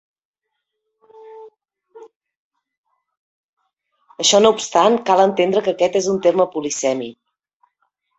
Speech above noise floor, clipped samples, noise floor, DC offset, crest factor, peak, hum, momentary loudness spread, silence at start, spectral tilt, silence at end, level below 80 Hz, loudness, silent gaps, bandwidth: 62 dB; under 0.1%; -78 dBFS; under 0.1%; 20 dB; 0 dBFS; none; 8 LU; 1.25 s; -3 dB/octave; 1.05 s; -64 dBFS; -16 LUFS; 2.16-2.21 s, 2.36-2.51 s, 2.77-2.84 s, 3.17-3.57 s; 8.2 kHz